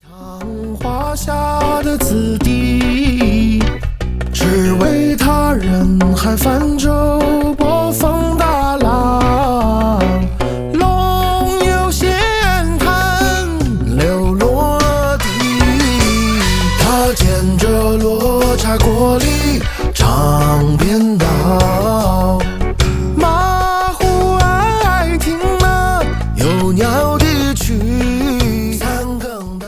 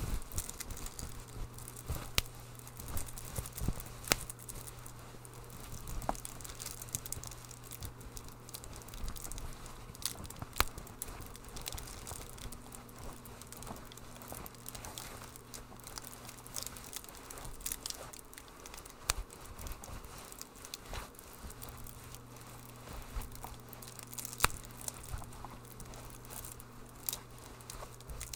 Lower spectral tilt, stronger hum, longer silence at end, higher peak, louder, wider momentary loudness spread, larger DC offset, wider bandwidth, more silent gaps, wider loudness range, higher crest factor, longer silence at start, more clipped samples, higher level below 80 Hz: first, -5.5 dB/octave vs -2.5 dB/octave; neither; about the same, 0 s vs 0 s; about the same, 0 dBFS vs 0 dBFS; first, -14 LUFS vs -43 LUFS; second, 5 LU vs 14 LU; neither; second, 16 kHz vs 19 kHz; neither; second, 2 LU vs 7 LU; second, 12 dB vs 42 dB; about the same, 0.1 s vs 0 s; neither; first, -20 dBFS vs -50 dBFS